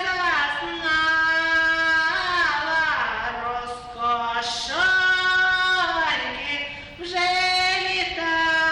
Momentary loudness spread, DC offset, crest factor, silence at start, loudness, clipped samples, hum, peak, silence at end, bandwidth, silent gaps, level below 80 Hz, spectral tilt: 9 LU; under 0.1%; 12 dB; 0 s; -21 LUFS; under 0.1%; none; -10 dBFS; 0 s; 11.5 kHz; none; -50 dBFS; -1.5 dB/octave